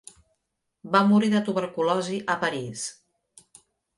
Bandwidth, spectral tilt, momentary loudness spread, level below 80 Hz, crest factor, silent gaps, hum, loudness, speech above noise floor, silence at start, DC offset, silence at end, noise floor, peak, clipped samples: 11.5 kHz; -5 dB/octave; 13 LU; -70 dBFS; 22 dB; none; none; -24 LUFS; 55 dB; 0.85 s; under 0.1%; 1.05 s; -79 dBFS; -4 dBFS; under 0.1%